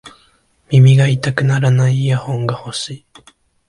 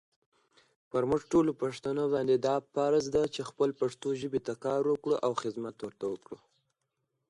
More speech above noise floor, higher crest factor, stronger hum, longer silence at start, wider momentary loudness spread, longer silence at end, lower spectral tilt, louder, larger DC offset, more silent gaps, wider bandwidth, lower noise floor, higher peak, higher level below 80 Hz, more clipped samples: second, 42 dB vs 52 dB; about the same, 14 dB vs 16 dB; neither; second, 0.05 s vs 0.95 s; first, 14 LU vs 10 LU; second, 0.7 s vs 0.95 s; about the same, -6.5 dB/octave vs -6 dB/octave; first, -14 LUFS vs -31 LUFS; neither; neither; about the same, 11 kHz vs 11.5 kHz; second, -55 dBFS vs -82 dBFS; first, 0 dBFS vs -16 dBFS; first, -52 dBFS vs -64 dBFS; neither